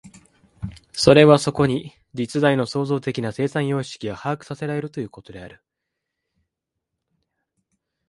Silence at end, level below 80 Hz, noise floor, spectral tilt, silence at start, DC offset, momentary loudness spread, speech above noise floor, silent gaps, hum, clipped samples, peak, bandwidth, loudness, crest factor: 2.6 s; -52 dBFS; -82 dBFS; -6 dB/octave; 0.05 s; under 0.1%; 22 LU; 62 dB; none; none; under 0.1%; 0 dBFS; 11.5 kHz; -20 LUFS; 22 dB